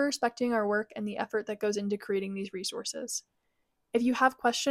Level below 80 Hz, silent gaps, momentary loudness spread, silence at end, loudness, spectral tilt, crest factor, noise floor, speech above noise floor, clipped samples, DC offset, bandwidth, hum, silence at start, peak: -74 dBFS; none; 10 LU; 0 s; -31 LUFS; -3.5 dB/octave; 20 dB; -78 dBFS; 47 dB; under 0.1%; under 0.1%; 15.5 kHz; none; 0 s; -10 dBFS